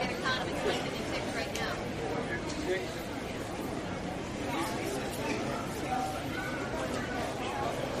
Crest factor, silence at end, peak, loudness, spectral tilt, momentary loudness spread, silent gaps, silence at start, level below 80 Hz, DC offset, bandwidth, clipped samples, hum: 16 dB; 0 s; -18 dBFS; -34 LUFS; -4.5 dB/octave; 5 LU; none; 0 s; -50 dBFS; under 0.1%; 15.5 kHz; under 0.1%; none